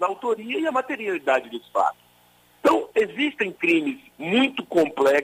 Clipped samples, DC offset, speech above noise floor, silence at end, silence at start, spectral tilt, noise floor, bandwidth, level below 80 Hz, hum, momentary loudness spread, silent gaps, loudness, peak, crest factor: under 0.1%; under 0.1%; 35 dB; 0 s; 0 s; -4.5 dB/octave; -57 dBFS; 16 kHz; -66 dBFS; 60 Hz at -60 dBFS; 6 LU; none; -23 LUFS; -8 dBFS; 16 dB